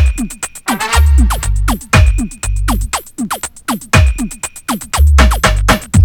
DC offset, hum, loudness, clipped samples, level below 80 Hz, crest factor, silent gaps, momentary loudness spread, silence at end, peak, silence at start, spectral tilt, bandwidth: under 0.1%; none; -14 LUFS; 0.2%; -14 dBFS; 12 dB; none; 11 LU; 0 s; 0 dBFS; 0 s; -4.5 dB/octave; 17.5 kHz